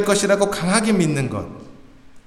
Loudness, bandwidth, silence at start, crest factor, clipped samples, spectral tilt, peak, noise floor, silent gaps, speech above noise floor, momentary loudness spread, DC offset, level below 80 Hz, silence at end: -19 LUFS; 15 kHz; 0 s; 18 dB; under 0.1%; -4.5 dB/octave; -2 dBFS; -43 dBFS; none; 25 dB; 12 LU; under 0.1%; -50 dBFS; 0.1 s